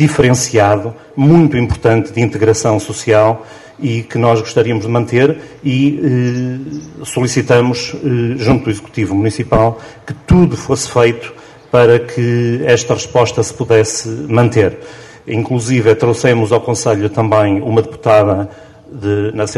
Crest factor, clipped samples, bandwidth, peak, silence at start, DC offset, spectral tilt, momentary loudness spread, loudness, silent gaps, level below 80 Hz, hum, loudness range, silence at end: 12 dB; under 0.1%; 12 kHz; 0 dBFS; 0 s; under 0.1%; -6 dB/octave; 10 LU; -13 LUFS; none; -38 dBFS; none; 2 LU; 0 s